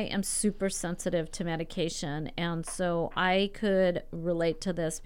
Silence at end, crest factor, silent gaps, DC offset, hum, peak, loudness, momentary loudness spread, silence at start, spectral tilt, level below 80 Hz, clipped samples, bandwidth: 0 s; 16 dB; none; under 0.1%; none; -14 dBFS; -30 LUFS; 7 LU; 0 s; -4.5 dB/octave; -46 dBFS; under 0.1%; 16.5 kHz